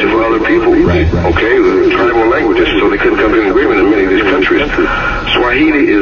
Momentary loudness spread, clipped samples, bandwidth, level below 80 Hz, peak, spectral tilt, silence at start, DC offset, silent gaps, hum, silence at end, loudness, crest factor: 3 LU; under 0.1%; 7 kHz; -24 dBFS; 0 dBFS; -7 dB/octave; 0 s; under 0.1%; none; none; 0 s; -10 LUFS; 10 dB